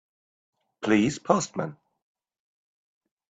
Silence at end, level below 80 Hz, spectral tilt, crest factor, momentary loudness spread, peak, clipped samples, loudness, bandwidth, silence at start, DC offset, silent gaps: 1.6 s; -66 dBFS; -5 dB/octave; 26 dB; 11 LU; -4 dBFS; under 0.1%; -25 LUFS; 9 kHz; 0.8 s; under 0.1%; none